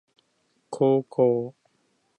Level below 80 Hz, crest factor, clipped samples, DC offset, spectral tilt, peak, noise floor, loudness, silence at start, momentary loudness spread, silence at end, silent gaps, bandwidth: -76 dBFS; 18 dB; under 0.1%; under 0.1%; -8.5 dB/octave; -8 dBFS; -70 dBFS; -23 LUFS; 0.7 s; 16 LU; 0.7 s; none; 9.6 kHz